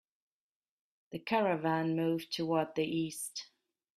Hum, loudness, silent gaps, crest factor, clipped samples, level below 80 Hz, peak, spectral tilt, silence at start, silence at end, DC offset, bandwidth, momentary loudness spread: none; -34 LUFS; none; 18 dB; under 0.1%; -76 dBFS; -18 dBFS; -5 dB/octave; 1.1 s; 0.5 s; under 0.1%; 15.5 kHz; 12 LU